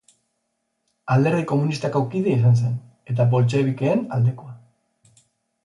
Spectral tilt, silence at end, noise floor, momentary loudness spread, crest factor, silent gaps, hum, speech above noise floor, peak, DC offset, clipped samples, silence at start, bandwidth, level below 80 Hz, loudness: -8.5 dB/octave; 1.1 s; -75 dBFS; 9 LU; 16 dB; none; none; 55 dB; -6 dBFS; under 0.1%; under 0.1%; 1.05 s; 11 kHz; -60 dBFS; -21 LUFS